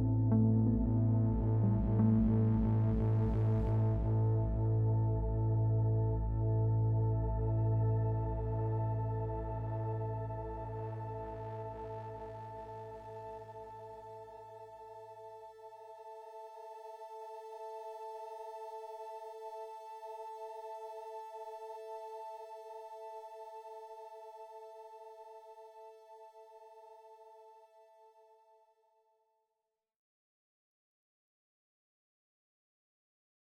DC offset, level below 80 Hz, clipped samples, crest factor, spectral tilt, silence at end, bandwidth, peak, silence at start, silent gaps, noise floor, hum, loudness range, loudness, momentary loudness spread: under 0.1%; -46 dBFS; under 0.1%; 16 dB; -11 dB/octave; 6 s; 3.5 kHz; -20 dBFS; 0 s; none; -89 dBFS; none; 20 LU; -35 LUFS; 21 LU